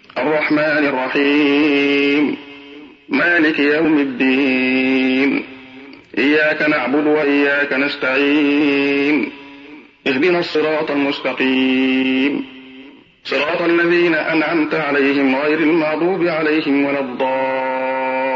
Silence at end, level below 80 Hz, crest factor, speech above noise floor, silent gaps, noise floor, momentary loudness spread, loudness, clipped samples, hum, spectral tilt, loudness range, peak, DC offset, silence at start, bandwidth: 0 s; -62 dBFS; 12 dB; 25 dB; none; -41 dBFS; 6 LU; -16 LUFS; under 0.1%; none; -6 dB/octave; 2 LU; -4 dBFS; under 0.1%; 0.15 s; 6.8 kHz